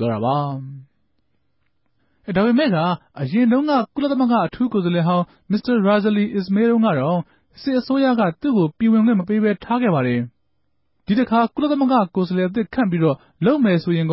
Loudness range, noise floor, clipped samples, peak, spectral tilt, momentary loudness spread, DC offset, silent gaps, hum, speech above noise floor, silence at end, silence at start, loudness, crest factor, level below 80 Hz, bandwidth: 2 LU; -72 dBFS; under 0.1%; -6 dBFS; -12 dB/octave; 7 LU; under 0.1%; none; none; 54 dB; 0 s; 0 s; -19 LUFS; 14 dB; -56 dBFS; 5.8 kHz